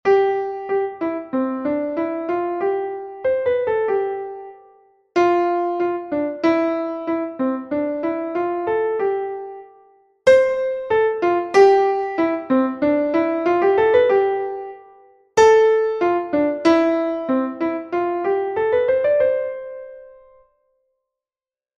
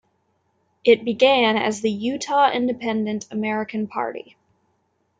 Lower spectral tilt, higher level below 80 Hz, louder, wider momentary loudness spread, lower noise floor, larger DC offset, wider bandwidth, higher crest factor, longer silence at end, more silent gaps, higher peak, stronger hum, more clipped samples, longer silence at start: about the same, -5 dB/octave vs -4.5 dB/octave; first, -58 dBFS vs -70 dBFS; about the same, -19 LUFS vs -21 LUFS; about the same, 11 LU vs 10 LU; first, under -90 dBFS vs -69 dBFS; neither; about the same, 8.6 kHz vs 9.4 kHz; about the same, 18 dB vs 18 dB; first, 1.7 s vs 1 s; neither; about the same, -2 dBFS vs -4 dBFS; neither; neither; second, 0.05 s vs 0.85 s